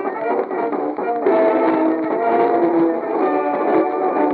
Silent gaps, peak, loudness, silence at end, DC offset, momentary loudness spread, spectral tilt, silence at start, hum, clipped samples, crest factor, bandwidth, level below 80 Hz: none; -4 dBFS; -18 LUFS; 0 s; under 0.1%; 6 LU; -5 dB/octave; 0 s; none; under 0.1%; 14 dB; 4.6 kHz; -70 dBFS